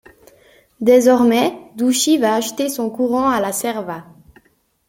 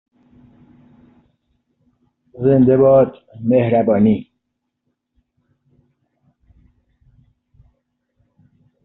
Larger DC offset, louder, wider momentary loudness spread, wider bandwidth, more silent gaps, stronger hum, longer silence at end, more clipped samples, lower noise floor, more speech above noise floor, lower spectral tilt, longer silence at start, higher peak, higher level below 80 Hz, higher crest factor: neither; about the same, -16 LUFS vs -15 LUFS; about the same, 10 LU vs 9 LU; first, 17 kHz vs 4 kHz; neither; neither; second, 0.85 s vs 4.6 s; neither; second, -60 dBFS vs -75 dBFS; second, 44 dB vs 62 dB; second, -3.5 dB/octave vs -9 dB/octave; second, 0.8 s vs 2.35 s; about the same, -2 dBFS vs -2 dBFS; about the same, -58 dBFS vs -54 dBFS; about the same, 16 dB vs 18 dB